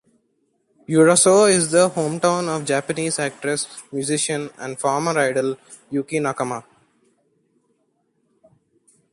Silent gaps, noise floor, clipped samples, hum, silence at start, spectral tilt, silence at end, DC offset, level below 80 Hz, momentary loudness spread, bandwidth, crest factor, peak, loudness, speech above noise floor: none; -68 dBFS; under 0.1%; none; 0.9 s; -4 dB/octave; 2.5 s; under 0.1%; -66 dBFS; 14 LU; 11.5 kHz; 18 dB; -2 dBFS; -19 LUFS; 48 dB